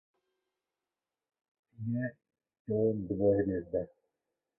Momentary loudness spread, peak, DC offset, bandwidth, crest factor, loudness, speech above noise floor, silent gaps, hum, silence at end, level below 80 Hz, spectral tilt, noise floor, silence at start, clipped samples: 14 LU; -18 dBFS; under 0.1%; 2.6 kHz; 18 dB; -33 LUFS; over 59 dB; 2.59-2.65 s; none; 0.7 s; -60 dBFS; -13.5 dB/octave; under -90 dBFS; 1.8 s; under 0.1%